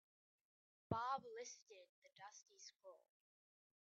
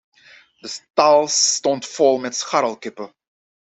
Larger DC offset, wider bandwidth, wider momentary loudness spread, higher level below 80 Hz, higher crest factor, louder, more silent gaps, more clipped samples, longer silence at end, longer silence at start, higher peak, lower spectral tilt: neither; second, 7.4 kHz vs 8.4 kHz; about the same, 21 LU vs 19 LU; second, -84 dBFS vs -68 dBFS; first, 26 dB vs 18 dB; second, -50 LUFS vs -18 LUFS; first, 1.89-2.02 s vs 0.90-0.94 s; neither; first, 0.85 s vs 0.65 s; first, 0.9 s vs 0.65 s; second, -28 dBFS vs -2 dBFS; first, -4.5 dB/octave vs -1.5 dB/octave